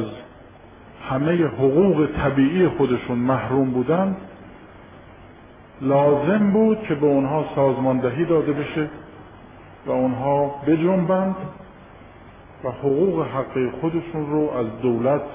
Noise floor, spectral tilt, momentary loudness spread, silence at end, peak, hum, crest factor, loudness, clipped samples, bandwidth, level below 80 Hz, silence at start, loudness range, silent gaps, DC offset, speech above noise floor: -45 dBFS; -12 dB/octave; 11 LU; 0 s; -6 dBFS; none; 14 dB; -21 LUFS; under 0.1%; 3.8 kHz; -48 dBFS; 0 s; 4 LU; none; under 0.1%; 25 dB